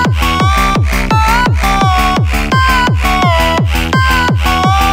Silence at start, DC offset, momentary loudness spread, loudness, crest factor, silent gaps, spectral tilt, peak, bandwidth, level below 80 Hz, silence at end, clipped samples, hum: 0 s; under 0.1%; 2 LU; -11 LUFS; 10 dB; none; -5 dB/octave; 0 dBFS; 16.5 kHz; -18 dBFS; 0 s; under 0.1%; none